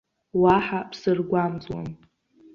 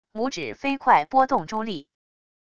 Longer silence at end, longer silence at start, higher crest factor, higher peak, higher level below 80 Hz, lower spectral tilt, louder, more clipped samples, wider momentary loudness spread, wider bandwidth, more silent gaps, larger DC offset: second, 0.6 s vs 0.75 s; first, 0.35 s vs 0.15 s; about the same, 20 dB vs 20 dB; about the same, -6 dBFS vs -6 dBFS; first, -54 dBFS vs -60 dBFS; first, -8 dB/octave vs -4.5 dB/octave; about the same, -24 LUFS vs -23 LUFS; neither; first, 15 LU vs 12 LU; about the same, 7 kHz vs 7.6 kHz; neither; second, under 0.1% vs 0.5%